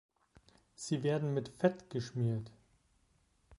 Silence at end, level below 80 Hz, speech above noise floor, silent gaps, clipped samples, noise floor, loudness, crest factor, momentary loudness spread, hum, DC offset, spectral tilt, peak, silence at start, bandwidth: 0.05 s; -68 dBFS; 38 dB; none; under 0.1%; -73 dBFS; -36 LUFS; 22 dB; 9 LU; none; under 0.1%; -6.5 dB/octave; -16 dBFS; 0.8 s; 11.5 kHz